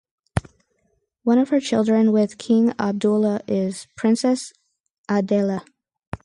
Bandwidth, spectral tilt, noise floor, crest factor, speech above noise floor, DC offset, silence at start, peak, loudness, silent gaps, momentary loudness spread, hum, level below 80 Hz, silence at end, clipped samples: 11.5 kHz; -6.5 dB/octave; -69 dBFS; 18 dB; 49 dB; under 0.1%; 0.35 s; -4 dBFS; -21 LUFS; 4.80-4.84 s, 4.90-5.04 s, 6.07-6.12 s; 11 LU; none; -48 dBFS; 0.1 s; under 0.1%